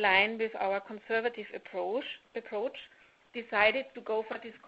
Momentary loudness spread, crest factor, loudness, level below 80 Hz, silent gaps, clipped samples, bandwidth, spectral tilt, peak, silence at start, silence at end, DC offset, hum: 16 LU; 24 dB; -32 LUFS; -70 dBFS; none; under 0.1%; 7.8 kHz; 0 dB/octave; -10 dBFS; 0 s; 0 s; under 0.1%; none